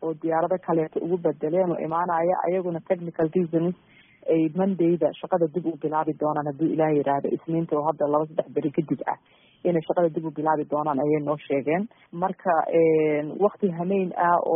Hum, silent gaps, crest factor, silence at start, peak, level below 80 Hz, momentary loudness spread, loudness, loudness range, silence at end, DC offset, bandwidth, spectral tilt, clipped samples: none; none; 16 dB; 0 s; -8 dBFS; -68 dBFS; 6 LU; -25 LUFS; 2 LU; 0 s; under 0.1%; 3.7 kHz; -4.5 dB/octave; under 0.1%